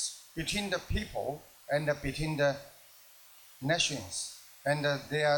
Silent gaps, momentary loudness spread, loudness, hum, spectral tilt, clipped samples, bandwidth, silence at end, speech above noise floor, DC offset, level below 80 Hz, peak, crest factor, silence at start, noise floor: none; 18 LU; -33 LUFS; none; -3.5 dB/octave; under 0.1%; 19 kHz; 0 s; 25 dB; under 0.1%; -50 dBFS; -14 dBFS; 18 dB; 0 s; -57 dBFS